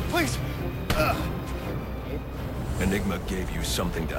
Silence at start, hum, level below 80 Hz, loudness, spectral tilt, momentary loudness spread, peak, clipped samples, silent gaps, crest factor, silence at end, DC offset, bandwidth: 0 s; none; -34 dBFS; -29 LUFS; -5 dB/octave; 8 LU; -10 dBFS; under 0.1%; none; 18 dB; 0 s; under 0.1%; 16.5 kHz